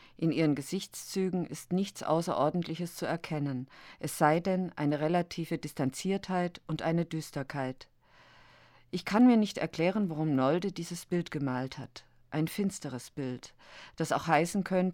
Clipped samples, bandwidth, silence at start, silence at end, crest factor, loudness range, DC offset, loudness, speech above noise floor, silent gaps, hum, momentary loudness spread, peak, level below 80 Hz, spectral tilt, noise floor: under 0.1%; 18 kHz; 0.2 s; 0 s; 20 dB; 6 LU; under 0.1%; -32 LUFS; 29 dB; none; none; 12 LU; -10 dBFS; -66 dBFS; -6 dB/octave; -60 dBFS